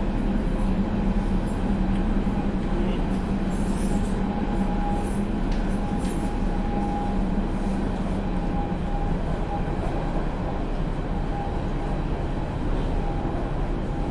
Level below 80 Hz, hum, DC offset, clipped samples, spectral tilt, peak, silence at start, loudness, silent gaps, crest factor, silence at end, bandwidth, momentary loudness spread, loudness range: -28 dBFS; none; under 0.1%; under 0.1%; -7.5 dB/octave; -12 dBFS; 0 s; -27 LUFS; none; 12 dB; 0 s; 11.5 kHz; 4 LU; 3 LU